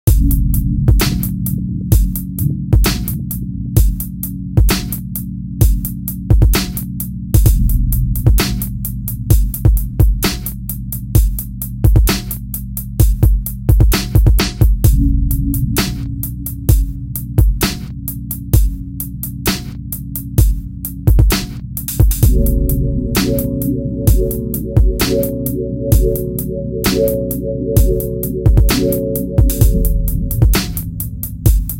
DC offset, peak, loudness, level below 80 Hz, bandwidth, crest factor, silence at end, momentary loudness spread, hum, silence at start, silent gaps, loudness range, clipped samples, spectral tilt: under 0.1%; 0 dBFS; -16 LUFS; -16 dBFS; 17.5 kHz; 14 dB; 0 s; 10 LU; none; 0.05 s; none; 3 LU; under 0.1%; -5.5 dB/octave